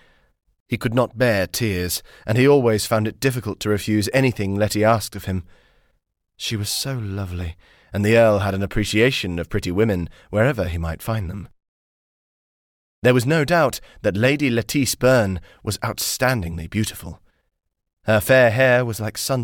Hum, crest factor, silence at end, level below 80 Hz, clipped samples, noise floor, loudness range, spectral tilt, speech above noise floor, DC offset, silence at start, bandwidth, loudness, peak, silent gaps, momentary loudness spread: none; 16 dB; 0 s; -42 dBFS; under 0.1%; under -90 dBFS; 5 LU; -5 dB/octave; over 70 dB; under 0.1%; 0.7 s; 18 kHz; -20 LUFS; -4 dBFS; 11.68-13.02 s; 12 LU